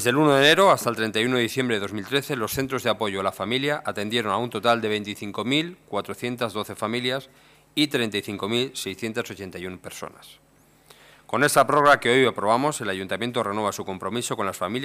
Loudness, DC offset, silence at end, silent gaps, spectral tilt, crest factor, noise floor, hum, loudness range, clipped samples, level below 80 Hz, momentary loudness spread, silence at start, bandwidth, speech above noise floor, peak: -23 LUFS; under 0.1%; 0 s; none; -4 dB/octave; 18 dB; -55 dBFS; none; 7 LU; under 0.1%; -62 dBFS; 14 LU; 0 s; 15.5 kHz; 31 dB; -6 dBFS